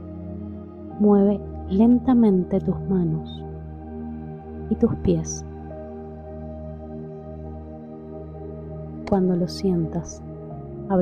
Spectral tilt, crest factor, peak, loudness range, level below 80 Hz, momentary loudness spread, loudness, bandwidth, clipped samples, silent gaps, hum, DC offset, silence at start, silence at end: -8 dB/octave; 18 dB; -6 dBFS; 15 LU; -42 dBFS; 19 LU; -22 LUFS; 9.4 kHz; under 0.1%; none; none; under 0.1%; 0 s; 0 s